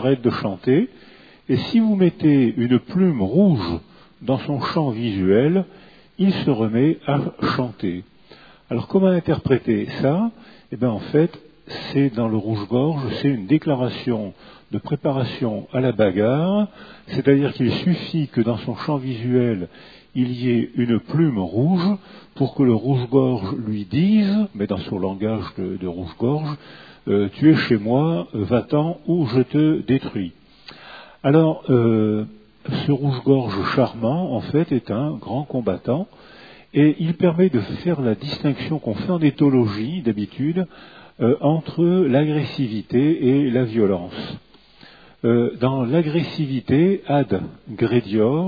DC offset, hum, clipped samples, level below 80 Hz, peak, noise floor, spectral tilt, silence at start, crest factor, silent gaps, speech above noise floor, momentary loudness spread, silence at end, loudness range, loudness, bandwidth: 0.1%; none; under 0.1%; -54 dBFS; -2 dBFS; -48 dBFS; -10 dB/octave; 0 s; 18 dB; none; 29 dB; 10 LU; 0 s; 3 LU; -20 LUFS; 5 kHz